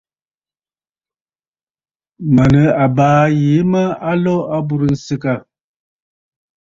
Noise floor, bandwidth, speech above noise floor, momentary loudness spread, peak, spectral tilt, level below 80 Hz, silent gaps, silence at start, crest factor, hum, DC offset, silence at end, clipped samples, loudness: under -90 dBFS; 7.6 kHz; over 77 dB; 9 LU; -2 dBFS; -8.5 dB/octave; -44 dBFS; none; 2.2 s; 14 dB; none; under 0.1%; 1.25 s; under 0.1%; -14 LUFS